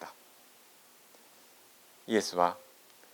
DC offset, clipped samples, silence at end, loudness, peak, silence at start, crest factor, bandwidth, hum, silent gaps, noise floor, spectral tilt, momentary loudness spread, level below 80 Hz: under 0.1%; under 0.1%; 0.5 s; -31 LUFS; -10 dBFS; 0 s; 26 dB; 19.5 kHz; none; none; -59 dBFS; -3.5 dB/octave; 26 LU; -84 dBFS